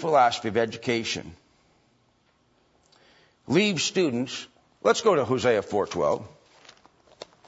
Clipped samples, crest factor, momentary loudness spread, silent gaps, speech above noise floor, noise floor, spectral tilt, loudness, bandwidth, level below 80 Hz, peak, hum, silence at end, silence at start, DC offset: under 0.1%; 18 dB; 14 LU; none; 42 dB; -66 dBFS; -4 dB/octave; -25 LUFS; 8 kHz; -64 dBFS; -8 dBFS; none; 1.2 s; 0 s; under 0.1%